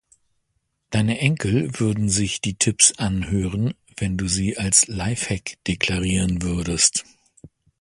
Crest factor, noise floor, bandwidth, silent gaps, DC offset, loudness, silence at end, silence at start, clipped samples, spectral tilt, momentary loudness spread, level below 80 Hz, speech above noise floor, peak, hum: 22 dB; -73 dBFS; 11.5 kHz; none; under 0.1%; -21 LUFS; 0.35 s; 0.9 s; under 0.1%; -3.5 dB/octave; 11 LU; -40 dBFS; 51 dB; 0 dBFS; none